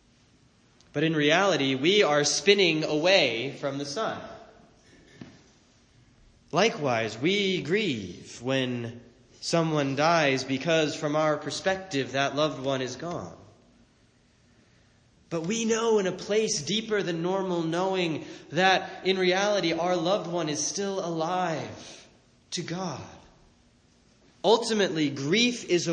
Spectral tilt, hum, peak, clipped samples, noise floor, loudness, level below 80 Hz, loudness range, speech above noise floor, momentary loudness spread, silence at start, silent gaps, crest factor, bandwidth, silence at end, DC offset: -4 dB/octave; none; -6 dBFS; under 0.1%; -62 dBFS; -26 LUFS; -66 dBFS; 9 LU; 36 dB; 13 LU; 0.95 s; none; 22 dB; 9.8 kHz; 0 s; under 0.1%